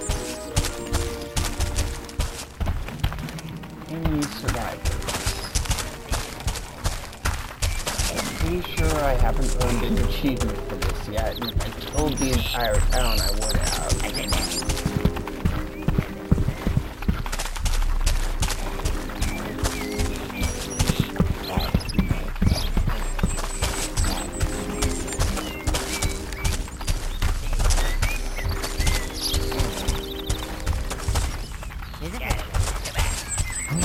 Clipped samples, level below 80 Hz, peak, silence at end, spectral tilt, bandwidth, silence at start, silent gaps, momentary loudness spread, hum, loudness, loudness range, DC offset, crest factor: under 0.1%; -28 dBFS; -6 dBFS; 0 s; -4 dB/octave; 16.5 kHz; 0 s; none; 6 LU; none; -26 LUFS; 4 LU; under 0.1%; 20 dB